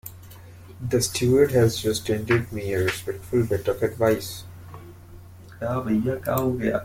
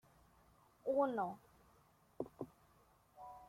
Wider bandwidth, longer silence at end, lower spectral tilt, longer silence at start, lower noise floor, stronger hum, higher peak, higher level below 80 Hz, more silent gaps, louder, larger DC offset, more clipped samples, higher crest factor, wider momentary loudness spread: about the same, 16.5 kHz vs 16 kHz; about the same, 0 s vs 0 s; second, -5.5 dB/octave vs -7.5 dB/octave; second, 0.05 s vs 0.85 s; second, -44 dBFS vs -71 dBFS; neither; first, -6 dBFS vs -24 dBFS; first, -50 dBFS vs -76 dBFS; neither; first, -23 LUFS vs -42 LUFS; neither; neither; about the same, 18 dB vs 20 dB; about the same, 20 LU vs 20 LU